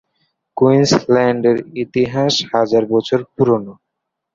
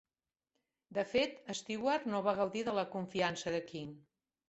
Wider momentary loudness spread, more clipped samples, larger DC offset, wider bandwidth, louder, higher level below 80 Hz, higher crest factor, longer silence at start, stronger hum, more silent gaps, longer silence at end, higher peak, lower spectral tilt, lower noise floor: about the same, 7 LU vs 9 LU; neither; neither; about the same, 7.6 kHz vs 8.2 kHz; first, -15 LUFS vs -36 LUFS; first, -54 dBFS vs -72 dBFS; second, 14 dB vs 20 dB; second, 0.55 s vs 0.9 s; neither; neither; about the same, 0.6 s vs 0.5 s; first, -2 dBFS vs -18 dBFS; about the same, -5.5 dB/octave vs -4.5 dB/octave; second, -77 dBFS vs under -90 dBFS